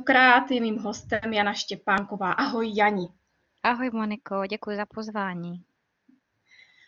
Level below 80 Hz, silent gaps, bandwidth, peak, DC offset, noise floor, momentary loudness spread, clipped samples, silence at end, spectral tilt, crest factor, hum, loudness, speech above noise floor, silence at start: -64 dBFS; none; 7.6 kHz; -6 dBFS; under 0.1%; -65 dBFS; 13 LU; under 0.1%; 1.3 s; -4.5 dB/octave; 20 dB; none; -25 LUFS; 40 dB; 0 s